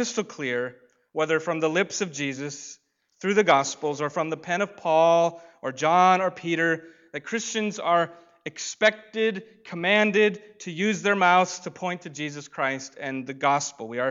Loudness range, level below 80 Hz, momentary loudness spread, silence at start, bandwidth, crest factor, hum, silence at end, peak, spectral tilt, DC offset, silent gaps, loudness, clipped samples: 3 LU; -78 dBFS; 15 LU; 0 s; 7.8 kHz; 20 dB; none; 0 s; -6 dBFS; -4 dB/octave; under 0.1%; none; -24 LUFS; under 0.1%